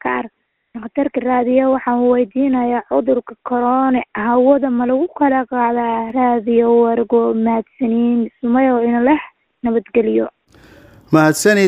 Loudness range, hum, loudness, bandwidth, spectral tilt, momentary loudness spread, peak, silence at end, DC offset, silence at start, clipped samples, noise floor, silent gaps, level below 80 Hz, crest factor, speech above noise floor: 2 LU; none; -16 LUFS; 15.5 kHz; -6 dB/octave; 7 LU; 0 dBFS; 0 s; under 0.1%; 0.05 s; under 0.1%; -45 dBFS; none; -54 dBFS; 16 dB; 30 dB